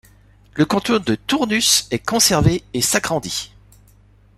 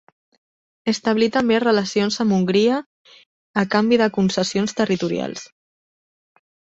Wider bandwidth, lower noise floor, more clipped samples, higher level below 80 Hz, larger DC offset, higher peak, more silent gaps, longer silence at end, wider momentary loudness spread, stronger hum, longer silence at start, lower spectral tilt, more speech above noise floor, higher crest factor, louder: first, 16 kHz vs 8 kHz; second, -51 dBFS vs under -90 dBFS; neither; first, -40 dBFS vs -60 dBFS; neither; about the same, -2 dBFS vs -4 dBFS; second, none vs 2.86-3.05 s, 3.26-3.54 s; second, 0.9 s vs 1.3 s; about the same, 11 LU vs 9 LU; first, 50 Hz at -45 dBFS vs none; second, 0.55 s vs 0.85 s; second, -3 dB/octave vs -5 dB/octave; second, 33 dB vs over 71 dB; about the same, 18 dB vs 18 dB; first, -17 LUFS vs -20 LUFS